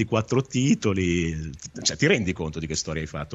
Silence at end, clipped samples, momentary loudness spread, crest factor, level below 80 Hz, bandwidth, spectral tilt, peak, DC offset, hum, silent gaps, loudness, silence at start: 0 s; under 0.1%; 9 LU; 18 dB; -44 dBFS; 8.2 kHz; -4.5 dB/octave; -6 dBFS; under 0.1%; none; none; -25 LUFS; 0 s